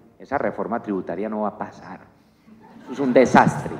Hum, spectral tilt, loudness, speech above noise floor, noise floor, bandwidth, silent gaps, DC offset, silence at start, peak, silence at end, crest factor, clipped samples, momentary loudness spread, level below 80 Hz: none; -6.5 dB/octave; -21 LUFS; 30 dB; -51 dBFS; 11.5 kHz; none; under 0.1%; 0.2 s; 0 dBFS; 0 s; 22 dB; under 0.1%; 20 LU; -56 dBFS